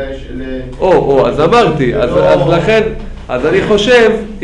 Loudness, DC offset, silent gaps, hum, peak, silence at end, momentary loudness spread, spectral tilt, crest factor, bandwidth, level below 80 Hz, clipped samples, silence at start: -10 LUFS; under 0.1%; none; none; 0 dBFS; 0 s; 15 LU; -6 dB/octave; 10 dB; 10.5 kHz; -28 dBFS; under 0.1%; 0 s